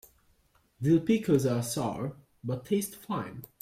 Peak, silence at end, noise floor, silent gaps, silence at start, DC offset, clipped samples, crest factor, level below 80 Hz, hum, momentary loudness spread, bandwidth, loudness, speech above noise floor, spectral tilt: -12 dBFS; 0.15 s; -67 dBFS; none; 0.8 s; under 0.1%; under 0.1%; 18 dB; -64 dBFS; none; 13 LU; 16.5 kHz; -30 LUFS; 39 dB; -6.5 dB/octave